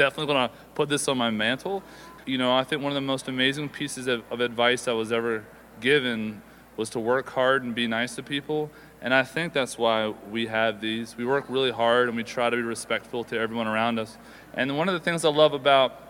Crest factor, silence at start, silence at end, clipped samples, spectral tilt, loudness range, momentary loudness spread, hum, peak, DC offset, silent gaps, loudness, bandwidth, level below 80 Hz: 22 dB; 0 s; 0 s; under 0.1%; -4 dB/octave; 1 LU; 10 LU; none; -4 dBFS; under 0.1%; none; -25 LUFS; 17 kHz; -62 dBFS